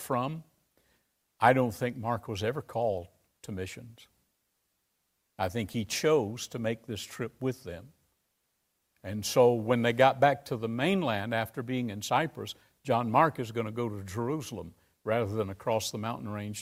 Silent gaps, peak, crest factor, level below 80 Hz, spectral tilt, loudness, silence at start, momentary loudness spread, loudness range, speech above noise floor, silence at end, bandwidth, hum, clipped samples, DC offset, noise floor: none; -8 dBFS; 24 dB; -66 dBFS; -5 dB/octave; -30 LUFS; 0 s; 17 LU; 9 LU; 49 dB; 0 s; 16 kHz; none; under 0.1%; under 0.1%; -78 dBFS